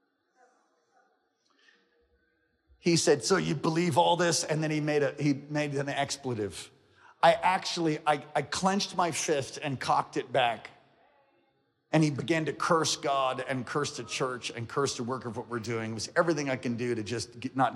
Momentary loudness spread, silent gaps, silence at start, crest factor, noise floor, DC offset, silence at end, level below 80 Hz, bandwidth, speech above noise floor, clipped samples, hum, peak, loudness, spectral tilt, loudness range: 10 LU; none; 2.85 s; 20 dB; -73 dBFS; under 0.1%; 0 s; -70 dBFS; 14.5 kHz; 44 dB; under 0.1%; none; -10 dBFS; -29 LUFS; -4.5 dB/octave; 4 LU